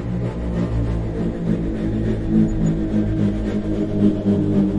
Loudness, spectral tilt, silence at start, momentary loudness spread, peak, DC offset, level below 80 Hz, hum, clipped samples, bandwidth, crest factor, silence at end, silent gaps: -21 LUFS; -9.5 dB/octave; 0 s; 6 LU; -6 dBFS; under 0.1%; -28 dBFS; none; under 0.1%; 8 kHz; 14 dB; 0 s; none